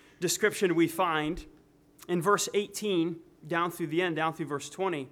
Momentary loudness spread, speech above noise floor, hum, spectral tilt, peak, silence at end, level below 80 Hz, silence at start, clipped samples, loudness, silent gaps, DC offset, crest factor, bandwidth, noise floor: 9 LU; 28 dB; none; -4 dB/octave; -10 dBFS; 0.05 s; -58 dBFS; 0.2 s; under 0.1%; -29 LUFS; none; under 0.1%; 20 dB; 18 kHz; -57 dBFS